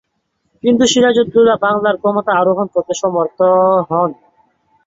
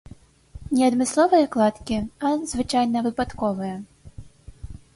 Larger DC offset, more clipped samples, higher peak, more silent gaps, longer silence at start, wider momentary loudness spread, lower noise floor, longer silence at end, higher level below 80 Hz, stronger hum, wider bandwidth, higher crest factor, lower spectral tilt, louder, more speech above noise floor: neither; neither; first, -2 dBFS vs -8 dBFS; neither; about the same, 0.65 s vs 0.55 s; second, 7 LU vs 20 LU; first, -67 dBFS vs -47 dBFS; first, 0.75 s vs 0.2 s; second, -54 dBFS vs -46 dBFS; neither; second, 7.8 kHz vs 11.5 kHz; about the same, 12 dB vs 16 dB; about the same, -4.5 dB/octave vs -5 dB/octave; first, -14 LUFS vs -22 LUFS; first, 54 dB vs 25 dB